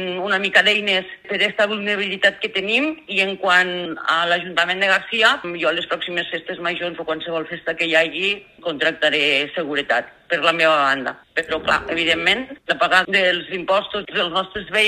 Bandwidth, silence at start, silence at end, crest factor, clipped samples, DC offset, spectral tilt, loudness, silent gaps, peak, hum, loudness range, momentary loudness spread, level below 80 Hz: 14.5 kHz; 0 s; 0 s; 20 dB; under 0.1%; under 0.1%; -3 dB/octave; -19 LUFS; none; 0 dBFS; none; 3 LU; 9 LU; -56 dBFS